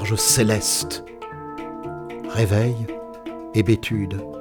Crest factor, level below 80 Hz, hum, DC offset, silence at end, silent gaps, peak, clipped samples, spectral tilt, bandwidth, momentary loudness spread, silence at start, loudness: 20 dB; -46 dBFS; none; under 0.1%; 0 s; none; -4 dBFS; under 0.1%; -4 dB/octave; over 20 kHz; 17 LU; 0 s; -21 LUFS